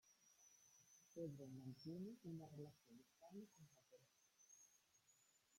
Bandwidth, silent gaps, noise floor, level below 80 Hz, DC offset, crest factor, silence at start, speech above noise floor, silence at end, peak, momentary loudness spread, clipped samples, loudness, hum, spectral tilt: 16.5 kHz; none; -79 dBFS; under -90 dBFS; under 0.1%; 20 dB; 0.05 s; 22 dB; 0 s; -40 dBFS; 14 LU; under 0.1%; -58 LUFS; none; -6.5 dB/octave